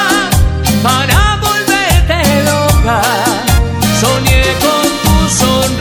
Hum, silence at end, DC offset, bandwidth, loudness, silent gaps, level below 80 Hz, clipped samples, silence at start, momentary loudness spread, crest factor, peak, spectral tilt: none; 0 s; under 0.1%; 20 kHz; -10 LUFS; none; -18 dBFS; 0.1%; 0 s; 2 LU; 10 dB; 0 dBFS; -4 dB/octave